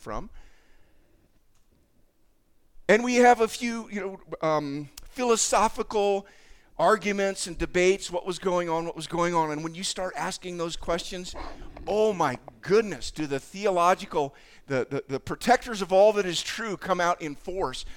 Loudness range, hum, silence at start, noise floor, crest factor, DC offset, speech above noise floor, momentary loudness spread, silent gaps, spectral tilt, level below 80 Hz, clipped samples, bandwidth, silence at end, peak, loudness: 4 LU; none; 0 s; -63 dBFS; 20 dB; under 0.1%; 37 dB; 13 LU; none; -4 dB/octave; -48 dBFS; under 0.1%; 18.5 kHz; 0 s; -6 dBFS; -26 LUFS